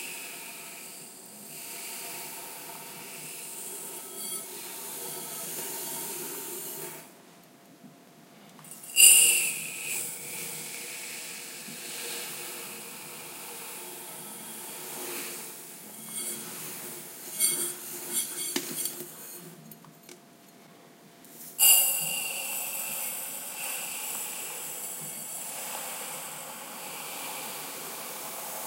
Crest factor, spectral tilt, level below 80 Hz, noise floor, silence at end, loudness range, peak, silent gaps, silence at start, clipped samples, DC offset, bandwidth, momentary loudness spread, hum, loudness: 32 dB; 0.5 dB/octave; under -90 dBFS; -54 dBFS; 0 s; 15 LU; -2 dBFS; none; 0 s; under 0.1%; under 0.1%; 16 kHz; 15 LU; none; -28 LUFS